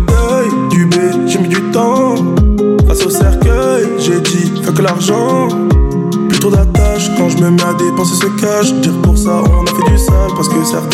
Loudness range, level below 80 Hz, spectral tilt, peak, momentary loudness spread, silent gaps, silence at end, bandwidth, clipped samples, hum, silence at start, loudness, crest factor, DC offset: 1 LU; -16 dBFS; -5.5 dB/octave; 0 dBFS; 2 LU; none; 0 s; 16 kHz; under 0.1%; none; 0 s; -11 LUFS; 10 dB; under 0.1%